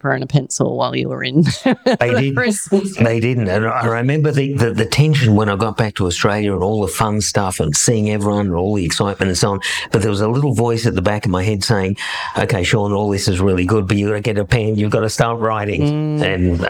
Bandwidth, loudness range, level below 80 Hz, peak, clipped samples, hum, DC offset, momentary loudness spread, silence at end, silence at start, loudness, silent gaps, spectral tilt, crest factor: 17 kHz; 1 LU; -40 dBFS; -2 dBFS; under 0.1%; none; under 0.1%; 3 LU; 0 s; 0.05 s; -16 LUFS; none; -5 dB/octave; 14 dB